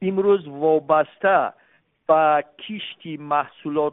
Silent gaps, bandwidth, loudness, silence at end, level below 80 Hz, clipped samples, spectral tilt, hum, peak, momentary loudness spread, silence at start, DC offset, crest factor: none; 3.9 kHz; -20 LUFS; 0 s; -70 dBFS; under 0.1%; -10.5 dB/octave; none; -4 dBFS; 14 LU; 0 s; under 0.1%; 16 dB